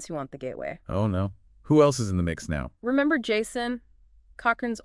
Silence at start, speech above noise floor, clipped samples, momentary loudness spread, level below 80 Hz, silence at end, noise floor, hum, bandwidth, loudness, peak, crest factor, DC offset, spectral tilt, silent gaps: 0 s; 30 dB; under 0.1%; 14 LU; -48 dBFS; 0.05 s; -56 dBFS; none; 12 kHz; -26 LUFS; -6 dBFS; 20 dB; under 0.1%; -6 dB/octave; none